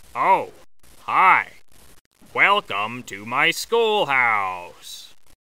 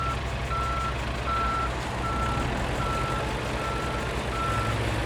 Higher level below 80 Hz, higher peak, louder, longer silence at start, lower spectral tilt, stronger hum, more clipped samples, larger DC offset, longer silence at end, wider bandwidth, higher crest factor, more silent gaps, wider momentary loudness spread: second, -62 dBFS vs -34 dBFS; first, -2 dBFS vs -14 dBFS; first, -19 LUFS vs -28 LUFS; first, 0.15 s vs 0 s; second, -2.5 dB/octave vs -5 dB/octave; neither; neither; first, 0.4% vs under 0.1%; first, 0.35 s vs 0 s; about the same, 16 kHz vs 16 kHz; first, 20 dB vs 14 dB; first, 2.01-2.11 s vs none; first, 21 LU vs 3 LU